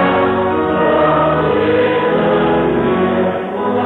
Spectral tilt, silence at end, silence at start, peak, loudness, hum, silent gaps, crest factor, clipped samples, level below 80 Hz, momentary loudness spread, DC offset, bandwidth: -9 dB/octave; 0 s; 0 s; -4 dBFS; -14 LUFS; none; none; 10 dB; under 0.1%; -40 dBFS; 4 LU; under 0.1%; 4.3 kHz